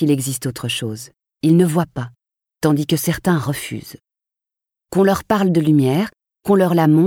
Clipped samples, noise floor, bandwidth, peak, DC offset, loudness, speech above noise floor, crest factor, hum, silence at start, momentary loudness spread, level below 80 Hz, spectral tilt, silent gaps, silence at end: under 0.1%; -87 dBFS; 18 kHz; -4 dBFS; under 0.1%; -18 LUFS; 71 dB; 14 dB; none; 0 s; 15 LU; -52 dBFS; -6 dB/octave; none; 0 s